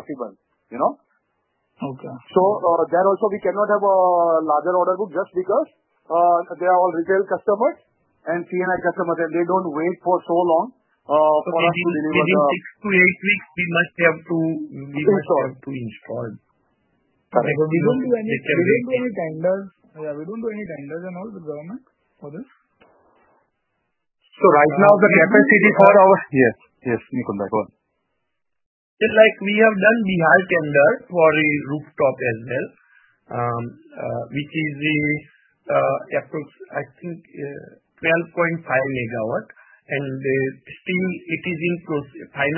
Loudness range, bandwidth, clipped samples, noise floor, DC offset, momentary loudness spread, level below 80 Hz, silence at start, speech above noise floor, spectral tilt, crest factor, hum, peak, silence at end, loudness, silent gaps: 10 LU; 3.2 kHz; under 0.1%; -79 dBFS; under 0.1%; 18 LU; -62 dBFS; 0.1 s; 60 dB; -10 dB/octave; 20 dB; none; 0 dBFS; 0 s; -19 LUFS; 28.66-28.97 s